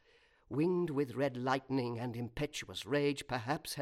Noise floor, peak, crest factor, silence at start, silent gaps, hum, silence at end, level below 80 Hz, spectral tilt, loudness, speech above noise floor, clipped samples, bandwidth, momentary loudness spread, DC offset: -68 dBFS; -16 dBFS; 20 dB; 0.5 s; none; none; 0 s; -62 dBFS; -5.5 dB/octave; -36 LUFS; 32 dB; under 0.1%; 16 kHz; 7 LU; under 0.1%